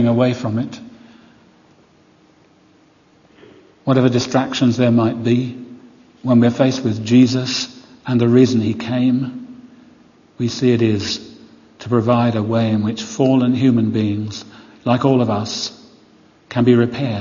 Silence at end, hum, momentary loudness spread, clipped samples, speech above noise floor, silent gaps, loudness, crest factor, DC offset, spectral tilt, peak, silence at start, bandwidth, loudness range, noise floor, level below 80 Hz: 0 s; none; 14 LU; under 0.1%; 37 dB; none; -17 LUFS; 16 dB; under 0.1%; -6.5 dB/octave; 0 dBFS; 0 s; 7.4 kHz; 6 LU; -52 dBFS; -58 dBFS